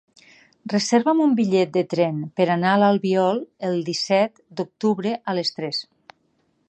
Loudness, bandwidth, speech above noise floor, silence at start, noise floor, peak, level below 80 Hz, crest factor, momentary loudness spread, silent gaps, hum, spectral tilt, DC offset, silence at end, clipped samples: -21 LUFS; 9 kHz; 46 dB; 0.65 s; -67 dBFS; -4 dBFS; -72 dBFS; 18 dB; 9 LU; none; none; -5.5 dB/octave; under 0.1%; 0.85 s; under 0.1%